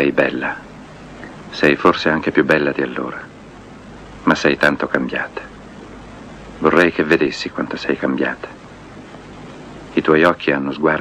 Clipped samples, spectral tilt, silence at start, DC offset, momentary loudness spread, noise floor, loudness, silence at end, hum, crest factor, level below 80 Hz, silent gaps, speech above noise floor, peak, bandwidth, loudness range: under 0.1%; -5.5 dB/octave; 0 s; under 0.1%; 24 LU; -38 dBFS; -17 LUFS; 0 s; none; 18 dB; -48 dBFS; none; 21 dB; 0 dBFS; 12.5 kHz; 3 LU